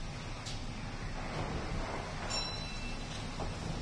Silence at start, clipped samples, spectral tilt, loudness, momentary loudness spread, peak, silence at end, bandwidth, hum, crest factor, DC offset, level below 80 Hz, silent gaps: 0 s; under 0.1%; -4 dB/octave; -40 LUFS; 6 LU; -24 dBFS; 0 s; 10.5 kHz; none; 14 dB; under 0.1%; -44 dBFS; none